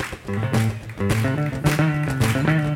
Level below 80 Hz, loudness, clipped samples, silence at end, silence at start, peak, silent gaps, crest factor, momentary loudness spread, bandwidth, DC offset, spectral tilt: -40 dBFS; -22 LUFS; under 0.1%; 0 s; 0 s; -4 dBFS; none; 18 dB; 7 LU; 17 kHz; under 0.1%; -6 dB/octave